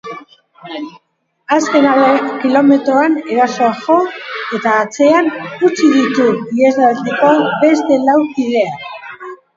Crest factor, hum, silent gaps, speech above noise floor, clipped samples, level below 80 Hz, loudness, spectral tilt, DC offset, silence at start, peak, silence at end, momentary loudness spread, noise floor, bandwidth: 12 dB; none; none; 25 dB; under 0.1%; -62 dBFS; -13 LUFS; -5 dB/octave; under 0.1%; 0.05 s; 0 dBFS; 0.2 s; 16 LU; -37 dBFS; 7.6 kHz